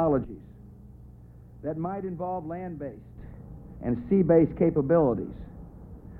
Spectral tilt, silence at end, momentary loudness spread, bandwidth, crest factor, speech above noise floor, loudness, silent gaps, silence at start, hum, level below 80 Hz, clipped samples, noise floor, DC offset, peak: -12.5 dB/octave; 0 s; 24 LU; 3 kHz; 18 dB; 23 dB; -26 LUFS; none; 0 s; none; -48 dBFS; under 0.1%; -48 dBFS; under 0.1%; -10 dBFS